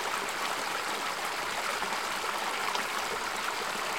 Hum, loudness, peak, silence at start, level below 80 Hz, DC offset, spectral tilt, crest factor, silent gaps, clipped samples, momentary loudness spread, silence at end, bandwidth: none; -31 LUFS; -14 dBFS; 0 s; -66 dBFS; 0.2%; -0.5 dB/octave; 18 dB; none; under 0.1%; 1 LU; 0 s; 17 kHz